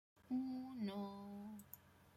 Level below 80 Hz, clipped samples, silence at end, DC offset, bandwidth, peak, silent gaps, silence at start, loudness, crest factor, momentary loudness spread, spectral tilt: -82 dBFS; under 0.1%; 0 s; under 0.1%; 15.5 kHz; -34 dBFS; none; 0.15 s; -48 LUFS; 14 dB; 14 LU; -7 dB/octave